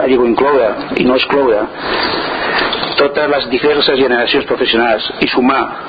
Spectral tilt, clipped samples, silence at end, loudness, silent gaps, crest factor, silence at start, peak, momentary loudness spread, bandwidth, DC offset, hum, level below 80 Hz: -7 dB/octave; under 0.1%; 0 s; -13 LUFS; none; 12 dB; 0 s; 0 dBFS; 4 LU; 5 kHz; under 0.1%; none; -42 dBFS